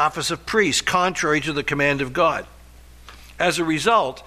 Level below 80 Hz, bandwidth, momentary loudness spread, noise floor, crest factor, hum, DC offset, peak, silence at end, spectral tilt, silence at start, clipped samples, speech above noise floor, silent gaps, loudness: -46 dBFS; 14.5 kHz; 5 LU; -45 dBFS; 16 dB; none; under 0.1%; -6 dBFS; 0.05 s; -3.5 dB/octave; 0 s; under 0.1%; 24 dB; none; -20 LUFS